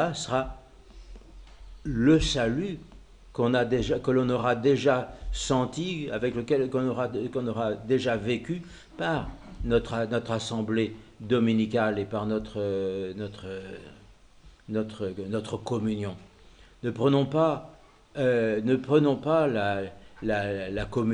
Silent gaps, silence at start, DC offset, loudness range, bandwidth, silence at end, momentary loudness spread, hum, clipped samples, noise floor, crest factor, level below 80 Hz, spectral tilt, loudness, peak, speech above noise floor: none; 0 s; under 0.1%; 8 LU; 10.5 kHz; 0 s; 13 LU; none; under 0.1%; -54 dBFS; 18 dB; -46 dBFS; -6 dB/octave; -27 LUFS; -10 dBFS; 27 dB